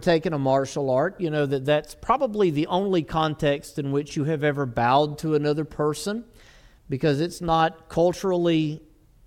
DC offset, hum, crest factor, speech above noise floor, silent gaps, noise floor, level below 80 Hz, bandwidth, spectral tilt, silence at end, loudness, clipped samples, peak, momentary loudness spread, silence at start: under 0.1%; none; 16 dB; 28 dB; none; -51 dBFS; -50 dBFS; 15.5 kHz; -6.5 dB/octave; 0.5 s; -24 LUFS; under 0.1%; -8 dBFS; 5 LU; 0 s